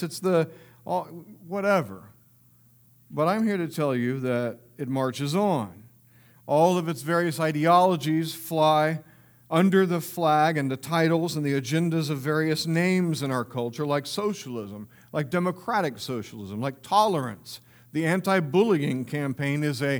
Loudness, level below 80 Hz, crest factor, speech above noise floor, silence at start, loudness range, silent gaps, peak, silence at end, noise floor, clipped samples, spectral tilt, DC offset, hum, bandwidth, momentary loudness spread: -25 LUFS; -72 dBFS; 18 dB; 33 dB; 0 s; 6 LU; none; -6 dBFS; 0 s; -58 dBFS; under 0.1%; -6 dB/octave; under 0.1%; none; over 20 kHz; 13 LU